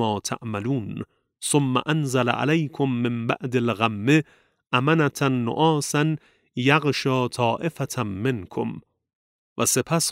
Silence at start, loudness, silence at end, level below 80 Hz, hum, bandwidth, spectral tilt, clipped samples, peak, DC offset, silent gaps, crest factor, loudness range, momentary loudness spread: 0 s; -23 LUFS; 0 s; -64 dBFS; none; 16 kHz; -5 dB/octave; under 0.1%; -2 dBFS; under 0.1%; 9.15-9.56 s; 22 dB; 3 LU; 11 LU